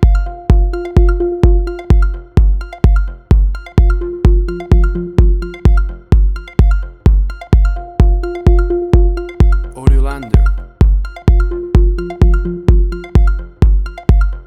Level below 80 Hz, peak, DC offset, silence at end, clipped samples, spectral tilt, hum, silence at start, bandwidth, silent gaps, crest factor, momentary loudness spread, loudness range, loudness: -12 dBFS; 0 dBFS; under 0.1%; 0.05 s; under 0.1%; -9 dB/octave; none; 0 s; 4.6 kHz; none; 10 dB; 3 LU; 1 LU; -14 LUFS